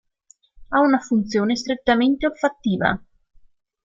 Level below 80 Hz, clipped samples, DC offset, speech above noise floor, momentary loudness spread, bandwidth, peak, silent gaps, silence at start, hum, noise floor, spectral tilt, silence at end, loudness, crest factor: -50 dBFS; under 0.1%; under 0.1%; 38 dB; 5 LU; 7.6 kHz; -2 dBFS; none; 0.6 s; none; -58 dBFS; -5.5 dB/octave; 0.85 s; -21 LUFS; 20 dB